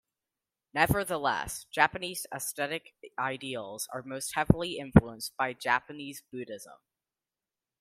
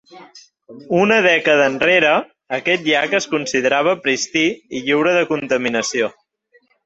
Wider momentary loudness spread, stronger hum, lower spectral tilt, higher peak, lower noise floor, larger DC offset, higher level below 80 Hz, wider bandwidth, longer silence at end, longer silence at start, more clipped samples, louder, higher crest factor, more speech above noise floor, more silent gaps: first, 17 LU vs 8 LU; neither; first, -5 dB/octave vs -3.5 dB/octave; about the same, -4 dBFS vs -2 dBFS; first, under -90 dBFS vs -58 dBFS; neither; first, -50 dBFS vs -62 dBFS; first, 16 kHz vs 8.2 kHz; first, 1.05 s vs 0.75 s; first, 0.75 s vs 0.15 s; neither; second, -30 LUFS vs -16 LUFS; first, 28 dB vs 16 dB; first, over 60 dB vs 41 dB; neither